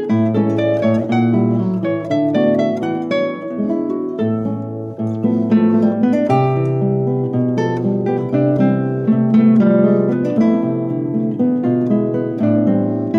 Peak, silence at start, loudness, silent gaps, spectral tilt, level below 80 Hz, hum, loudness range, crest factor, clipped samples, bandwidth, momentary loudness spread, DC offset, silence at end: -2 dBFS; 0 s; -16 LUFS; none; -9.5 dB/octave; -58 dBFS; none; 4 LU; 12 dB; under 0.1%; 6.4 kHz; 7 LU; under 0.1%; 0 s